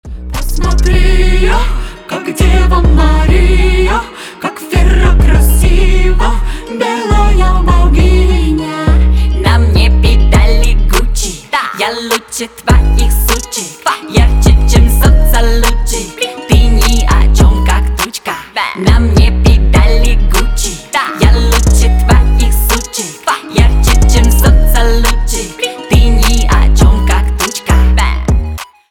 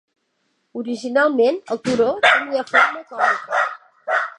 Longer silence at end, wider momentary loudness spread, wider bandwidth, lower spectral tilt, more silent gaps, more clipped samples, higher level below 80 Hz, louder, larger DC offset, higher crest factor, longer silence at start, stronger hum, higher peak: first, 0.25 s vs 0.05 s; second, 8 LU vs 12 LU; first, 17.5 kHz vs 11 kHz; first, -5 dB/octave vs -3.5 dB/octave; neither; neither; first, -8 dBFS vs -64 dBFS; first, -11 LUFS vs -18 LUFS; neither; second, 8 dB vs 18 dB; second, 0.05 s vs 0.75 s; neither; about the same, 0 dBFS vs -2 dBFS